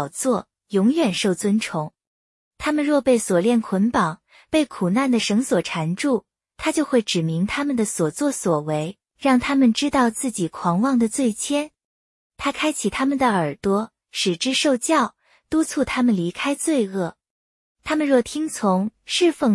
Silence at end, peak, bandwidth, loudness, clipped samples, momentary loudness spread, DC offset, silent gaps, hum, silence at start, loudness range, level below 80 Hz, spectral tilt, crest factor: 0 s; -4 dBFS; 12 kHz; -21 LUFS; under 0.1%; 8 LU; under 0.1%; 2.07-2.51 s, 11.85-12.30 s, 17.30-17.75 s; none; 0 s; 2 LU; -54 dBFS; -4.5 dB/octave; 16 dB